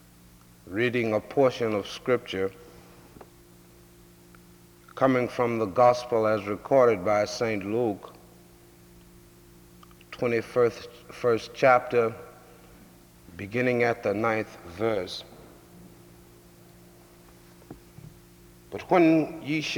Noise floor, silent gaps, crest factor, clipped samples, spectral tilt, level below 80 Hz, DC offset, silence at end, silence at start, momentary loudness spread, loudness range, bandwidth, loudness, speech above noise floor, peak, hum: -54 dBFS; none; 22 dB; under 0.1%; -6 dB/octave; -62 dBFS; under 0.1%; 0 s; 0.65 s; 20 LU; 9 LU; over 20 kHz; -25 LUFS; 29 dB; -6 dBFS; none